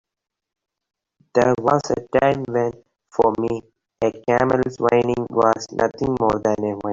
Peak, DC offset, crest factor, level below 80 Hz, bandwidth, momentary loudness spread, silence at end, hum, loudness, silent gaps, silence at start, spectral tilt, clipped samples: -2 dBFS; under 0.1%; 18 dB; -50 dBFS; 7.6 kHz; 7 LU; 0 s; none; -20 LUFS; none; 1.35 s; -6.5 dB/octave; under 0.1%